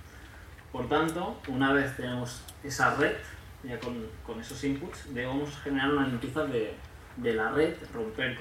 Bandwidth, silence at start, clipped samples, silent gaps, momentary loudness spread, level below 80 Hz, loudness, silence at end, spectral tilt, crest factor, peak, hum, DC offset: 16.5 kHz; 0 s; under 0.1%; none; 16 LU; -52 dBFS; -31 LUFS; 0 s; -5 dB/octave; 22 dB; -10 dBFS; none; under 0.1%